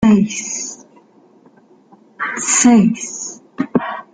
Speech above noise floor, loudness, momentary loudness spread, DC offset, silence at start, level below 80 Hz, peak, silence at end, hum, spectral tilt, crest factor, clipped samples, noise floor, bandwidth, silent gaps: 35 dB; -16 LUFS; 17 LU; under 0.1%; 0 s; -52 dBFS; -2 dBFS; 0.1 s; none; -4 dB/octave; 16 dB; under 0.1%; -49 dBFS; 9.6 kHz; none